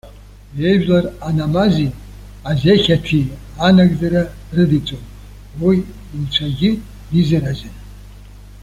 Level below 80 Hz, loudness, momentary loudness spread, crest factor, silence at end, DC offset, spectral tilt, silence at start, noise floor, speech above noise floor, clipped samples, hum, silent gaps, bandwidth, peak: -36 dBFS; -16 LUFS; 15 LU; 16 dB; 0 s; under 0.1%; -7.5 dB/octave; 0.05 s; -38 dBFS; 23 dB; under 0.1%; 50 Hz at -35 dBFS; none; 11.5 kHz; -2 dBFS